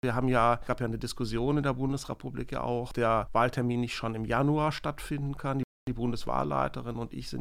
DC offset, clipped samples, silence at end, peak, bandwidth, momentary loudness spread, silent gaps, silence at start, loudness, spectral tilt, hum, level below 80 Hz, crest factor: under 0.1%; under 0.1%; 0 s; -12 dBFS; 15.5 kHz; 10 LU; 5.64-5.87 s; 0.05 s; -30 LUFS; -6.5 dB/octave; none; -46 dBFS; 18 dB